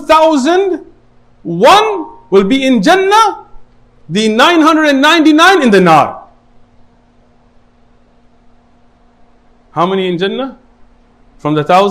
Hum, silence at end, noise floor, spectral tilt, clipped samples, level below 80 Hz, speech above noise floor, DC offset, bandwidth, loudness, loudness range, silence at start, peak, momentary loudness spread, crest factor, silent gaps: none; 0 s; -47 dBFS; -4.5 dB/octave; 0.4%; -46 dBFS; 39 dB; under 0.1%; 16 kHz; -9 LUFS; 11 LU; 0 s; 0 dBFS; 15 LU; 12 dB; none